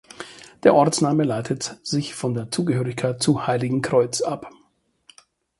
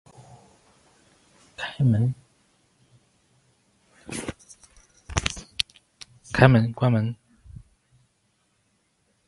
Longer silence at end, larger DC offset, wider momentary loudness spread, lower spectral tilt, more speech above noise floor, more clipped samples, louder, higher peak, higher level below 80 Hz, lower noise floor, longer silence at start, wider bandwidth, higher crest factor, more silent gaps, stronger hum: second, 1.1 s vs 2.15 s; neither; second, 10 LU vs 29 LU; about the same, -5.5 dB/octave vs -6 dB/octave; second, 42 dB vs 49 dB; neither; about the same, -22 LUFS vs -24 LUFS; about the same, -2 dBFS vs 0 dBFS; second, -60 dBFS vs -46 dBFS; second, -63 dBFS vs -69 dBFS; second, 0.2 s vs 1.6 s; about the same, 11.5 kHz vs 11.5 kHz; second, 20 dB vs 28 dB; neither; neither